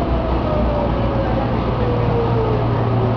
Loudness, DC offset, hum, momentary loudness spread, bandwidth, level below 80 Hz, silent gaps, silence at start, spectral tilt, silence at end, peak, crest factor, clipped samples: -19 LUFS; under 0.1%; none; 2 LU; 5.4 kHz; -24 dBFS; none; 0 s; -9.5 dB/octave; 0 s; -6 dBFS; 12 dB; under 0.1%